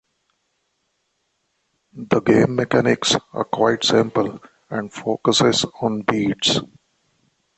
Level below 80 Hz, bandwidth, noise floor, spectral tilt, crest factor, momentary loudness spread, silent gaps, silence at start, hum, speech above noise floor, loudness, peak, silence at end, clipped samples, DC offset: -56 dBFS; 8.8 kHz; -71 dBFS; -4 dB/octave; 20 dB; 10 LU; none; 1.95 s; none; 52 dB; -19 LUFS; -2 dBFS; 0.95 s; under 0.1%; under 0.1%